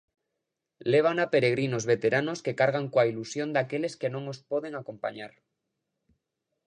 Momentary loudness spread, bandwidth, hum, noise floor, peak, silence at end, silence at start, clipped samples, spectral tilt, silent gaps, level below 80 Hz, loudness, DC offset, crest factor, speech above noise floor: 12 LU; 10 kHz; none; -84 dBFS; -10 dBFS; 1.4 s; 0.85 s; under 0.1%; -5.5 dB/octave; none; -74 dBFS; -28 LUFS; under 0.1%; 20 dB; 57 dB